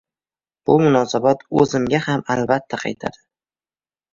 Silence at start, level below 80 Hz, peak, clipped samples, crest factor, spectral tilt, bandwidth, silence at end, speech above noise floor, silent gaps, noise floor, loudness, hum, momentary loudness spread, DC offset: 0.7 s; -54 dBFS; -2 dBFS; under 0.1%; 18 dB; -6 dB/octave; 7.6 kHz; 1.05 s; over 72 dB; none; under -90 dBFS; -18 LUFS; none; 12 LU; under 0.1%